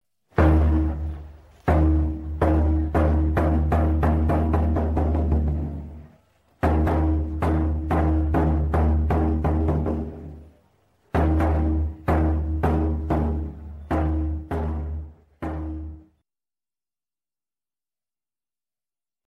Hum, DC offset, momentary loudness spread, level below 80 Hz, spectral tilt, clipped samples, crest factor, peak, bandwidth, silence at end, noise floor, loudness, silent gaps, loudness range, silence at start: none; under 0.1%; 13 LU; -26 dBFS; -10 dB/octave; under 0.1%; 16 dB; -6 dBFS; 3.9 kHz; 3.25 s; under -90 dBFS; -23 LUFS; none; 10 LU; 0.35 s